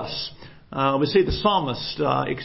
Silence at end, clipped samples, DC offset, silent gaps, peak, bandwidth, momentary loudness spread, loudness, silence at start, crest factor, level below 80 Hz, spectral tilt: 0 s; under 0.1%; under 0.1%; none; -6 dBFS; 5.8 kHz; 11 LU; -22 LUFS; 0 s; 18 dB; -40 dBFS; -9 dB/octave